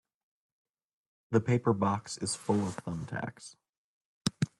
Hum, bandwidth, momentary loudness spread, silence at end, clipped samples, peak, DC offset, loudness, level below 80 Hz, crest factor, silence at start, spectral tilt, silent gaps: none; 12 kHz; 12 LU; 0.15 s; under 0.1%; -12 dBFS; under 0.1%; -32 LUFS; -66 dBFS; 22 dB; 1.3 s; -5.5 dB/octave; 3.69-4.25 s